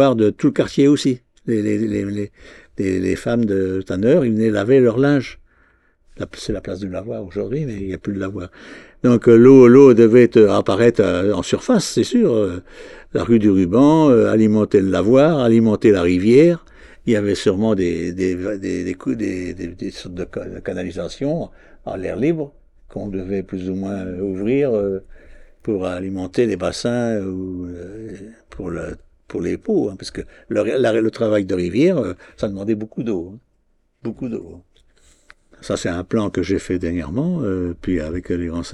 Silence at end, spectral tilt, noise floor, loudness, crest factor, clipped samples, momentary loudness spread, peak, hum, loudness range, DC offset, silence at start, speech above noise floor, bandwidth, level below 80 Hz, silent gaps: 0 s; -7 dB/octave; -62 dBFS; -17 LUFS; 18 dB; under 0.1%; 17 LU; 0 dBFS; none; 14 LU; under 0.1%; 0 s; 45 dB; 12 kHz; -46 dBFS; none